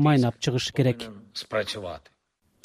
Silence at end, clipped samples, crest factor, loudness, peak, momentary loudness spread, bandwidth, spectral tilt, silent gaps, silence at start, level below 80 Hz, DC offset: 0.65 s; under 0.1%; 18 dB; -26 LUFS; -10 dBFS; 15 LU; 14.5 kHz; -6 dB/octave; none; 0 s; -58 dBFS; under 0.1%